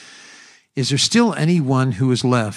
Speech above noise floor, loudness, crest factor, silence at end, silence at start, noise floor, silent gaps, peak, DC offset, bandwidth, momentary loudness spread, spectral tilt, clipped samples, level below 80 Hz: 29 dB; -17 LUFS; 16 dB; 0 s; 0 s; -46 dBFS; none; -4 dBFS; under 0.1%; 12 kHz; 6 LU; -5 dB/octave; under 0.1%; -60 dBFS